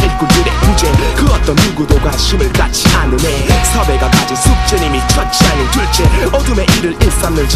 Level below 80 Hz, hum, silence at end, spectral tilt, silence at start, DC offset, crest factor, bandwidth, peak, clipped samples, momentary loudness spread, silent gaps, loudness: -14 dBFS; none; 0 s; -4.5 dB/octave; 0 s; under 0.1%; 10 dB; 15.5 kHz; 0 dBFS; 0.4%; 3 LU; none; -11 LUFS